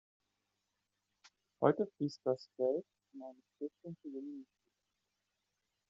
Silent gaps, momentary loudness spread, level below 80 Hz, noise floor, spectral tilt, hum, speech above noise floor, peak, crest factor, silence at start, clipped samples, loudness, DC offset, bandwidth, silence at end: none; 20 LU; -88 dBFS; -87 dBFS; -6.5 dB/octave; none; 48 dB; -14 dBFS; 26 dB; 1.6 s; under 0.1%; -38 LUFS; under 0.1%; 7.4 kHz; 1.45 s